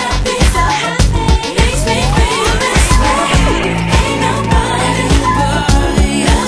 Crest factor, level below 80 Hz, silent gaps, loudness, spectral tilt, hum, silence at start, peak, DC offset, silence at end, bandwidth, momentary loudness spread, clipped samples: 12 dB; -16 dBFS; none; -12 LUFS; -4.5 dB/octave; none; 0 s; 0 dBFS; 0.2%; 0 s; 11 kHz; 2 LU; under 0.1%